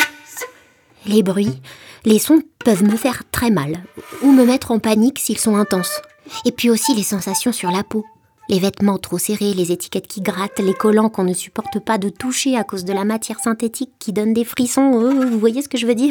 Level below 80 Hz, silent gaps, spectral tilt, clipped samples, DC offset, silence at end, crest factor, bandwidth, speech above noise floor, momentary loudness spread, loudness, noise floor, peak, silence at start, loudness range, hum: -54 dBFS; none; -4.5 dB/octave; under 0.1%; under 0.1%; 0 s; 16 dB; over 20 kHz; 33 dB; 11 LU; -17 LUFS; -50 dBFS; 0 dBFS; 0 s; 4 LU; none